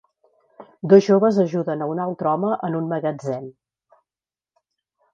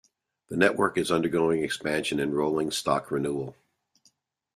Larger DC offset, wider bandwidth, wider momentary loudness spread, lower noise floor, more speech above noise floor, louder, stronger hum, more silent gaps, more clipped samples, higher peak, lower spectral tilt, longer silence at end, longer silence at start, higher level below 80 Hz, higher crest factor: neither; second, 7.4 kHz vs 14 kHz; first, 15 LU vs 7 LU; first, under -90 dBFS vs -67 dBFS; first, over 71 dB vs 41 dB; first, -20 LUFS vs -26 LUFS; neither; neither; neither; first, -2 dBFS vs -6 dBFS; first, -8 dB/octave vs -4.5 dB/octave; first, 1.65 s vs 1.05 s; about the same, 0.6 s vs 0.5 s; second, -70 dBFS vs -62 dBFS; about the same, 20 dB vs 22 dB